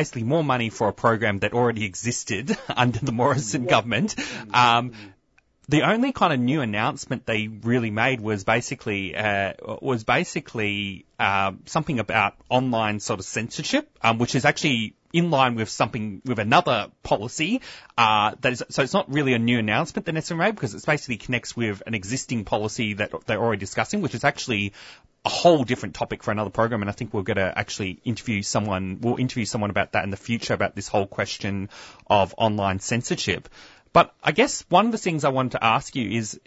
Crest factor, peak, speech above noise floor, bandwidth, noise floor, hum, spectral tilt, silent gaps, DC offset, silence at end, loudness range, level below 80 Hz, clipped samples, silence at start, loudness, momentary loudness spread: 20 dB; -4 dBFS; 40 dB; 8 kHz; -63 dBFS; none; -4.5 dB/octave; none; under 0.1%; 0.1 s; 4 LU; -54 dBFS; under 0.1%; 0 s; -23 LUFS; 8 LU